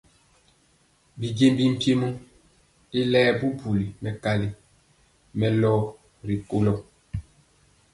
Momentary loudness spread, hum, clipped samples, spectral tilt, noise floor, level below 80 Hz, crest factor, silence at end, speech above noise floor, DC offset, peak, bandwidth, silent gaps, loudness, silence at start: 17 LU; none; under 0.1%; -7 dB/octave; -63 dBFS; -52 dBFS; 18 dB; 0.75 s; 40 dB; under 0.1%; -8 dBFS; 11.5 kHz; none; -24 LUFS; 1.15 s